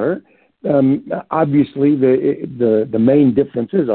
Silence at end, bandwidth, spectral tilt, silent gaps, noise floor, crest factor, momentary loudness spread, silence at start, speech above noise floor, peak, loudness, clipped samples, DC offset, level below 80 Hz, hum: 0 s; 4.2 kHz; -13.5 dB/octave; none; -38 dBFS; 12 dB; 8 LU; 0 s; 23 dB; -2 dBFS; -15 LUFS; under 0.1%; under 0.1%; -56 dBFS; none